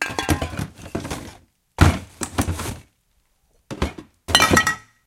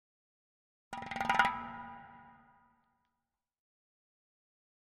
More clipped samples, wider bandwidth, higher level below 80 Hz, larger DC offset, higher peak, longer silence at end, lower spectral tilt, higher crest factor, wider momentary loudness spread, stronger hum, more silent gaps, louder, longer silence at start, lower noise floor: neither; first, 17 kHz vs 12 kHz; first, -34 dBFS vs -68 dBFS; neither; first, 0 dBFS vs -12 dBFS; second, 0.25 s vs 2.55 s; about the same, -3.5 dB/octave vs -3 dB/octave; about the same, 24 dB vs 28 dB; about the same, 23 LU vs 22 LU; neither; neither; first, -21 LUFS vs -34 LUFS; second, 0 s vs 0.9 s; second, -65 dBFS vs -89 dBFS